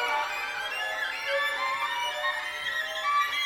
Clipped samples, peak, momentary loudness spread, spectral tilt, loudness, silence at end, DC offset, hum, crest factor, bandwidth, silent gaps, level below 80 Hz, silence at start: under 0.1%; -16 dBFS; 4 LU; 0.5 dB/octave; -28 LUFS; 0 s; under 0.1%; none; 14 dB; 20 kHz; none; -68 dBFS; 0 s